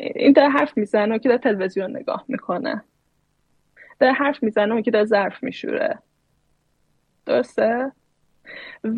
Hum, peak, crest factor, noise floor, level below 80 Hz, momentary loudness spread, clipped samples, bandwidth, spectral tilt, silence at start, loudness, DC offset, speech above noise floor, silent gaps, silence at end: none; -2 dBFS; 20 dB; -67 dBFS; -70 dBFS; 15 LU; under 0.1%; 9.2 kHz; -7 dB/octave; 0 s; -20 LUFS; under 0.1%; 47 dB; none; 0 s